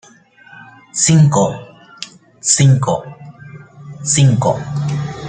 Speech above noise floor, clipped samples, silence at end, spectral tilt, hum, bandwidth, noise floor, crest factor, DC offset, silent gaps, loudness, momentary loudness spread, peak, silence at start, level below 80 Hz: 32 dB; under 0.1%; 0 s; -5 dB/octave; none; 9.6 kHz; -45 dBFS; 16 dB; under 0.1%; none; -14 LUFS; 22 LU; 0 dBFS; 0.55 s; -50 dBFS